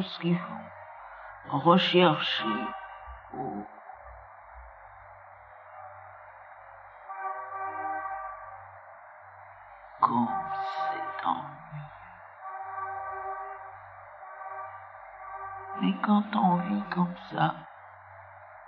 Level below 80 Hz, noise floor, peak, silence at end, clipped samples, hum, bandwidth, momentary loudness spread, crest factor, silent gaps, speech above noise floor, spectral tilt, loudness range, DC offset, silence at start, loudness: -62 dBFS; -50 dBFS; -6 dBFS; 0 s; under 0.1%; none; 6.8 kHz; 23 LU; 26 dB; none; 24 dB; -7.5 dB/octave; 16 LU; under 0.1%; 0 s; -29 LUFS